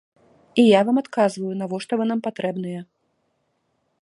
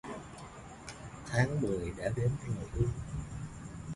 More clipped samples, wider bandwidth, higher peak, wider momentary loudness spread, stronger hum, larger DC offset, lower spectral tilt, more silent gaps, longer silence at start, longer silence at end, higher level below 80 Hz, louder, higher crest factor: neither; about the same, 11.5 kHz vs 11.5 kHz; first, -2 dBFS vs -14 dBFS; about the same, 14 LU vs 16 LU; neither; neither; about the same, -6 dB/octave vs -6.5 dB/octave; neither; first, 0.55 s vs 0.05 s; first, 1.2 s vs 0 s; second, -72 dBFS vs -48 dBFS; first, -21 LUFS vs -36 LUFS; about the same, 20 dB vs 22 dB